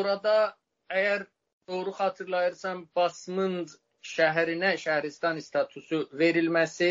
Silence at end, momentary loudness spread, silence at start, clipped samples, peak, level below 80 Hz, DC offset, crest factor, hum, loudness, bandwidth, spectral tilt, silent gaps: 0 s; 11 LU; 0 s; under 0.1%; -10 dBFS; -78 dBFS; under 0.1%; 18 dB; none; -28 LUFS; 7.6 kHz; -3 dB/octave; 1.53-1.61 s